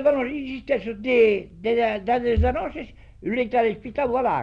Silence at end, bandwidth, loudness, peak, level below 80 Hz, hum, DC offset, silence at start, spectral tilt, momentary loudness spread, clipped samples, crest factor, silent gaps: 0 s; 5.6 kHz; -23 LUFS; -8 dBFS; -36 dBFS; none; under 0.1%; 0 s; -8 dB/octave; 12 LU; under 0.1%; 14 dB; none